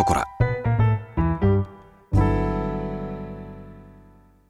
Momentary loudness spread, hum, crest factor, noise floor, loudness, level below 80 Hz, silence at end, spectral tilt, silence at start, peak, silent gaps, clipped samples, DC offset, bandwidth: 16 LU; 50 Hz at -35 dBFS; 20 dB; -52 dBFS; -24 LUFS; -34 dBFS; 0.55 s; -8 dB/octave; 0 s; -4 dBFS; none; under 0.1%; under 0.1%; 12 kHz